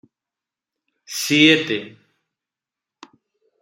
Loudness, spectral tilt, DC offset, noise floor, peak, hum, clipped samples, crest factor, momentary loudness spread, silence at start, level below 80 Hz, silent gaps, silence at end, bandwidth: -16 LUFS; -3.5 dB/octave; under 0.1%; -88 dBFS; -2 dBFS; none; under 0.1%; 22 dB; 14 LU; 1.1 s; -68 dBFS; none; 1.7 s; 16 kHz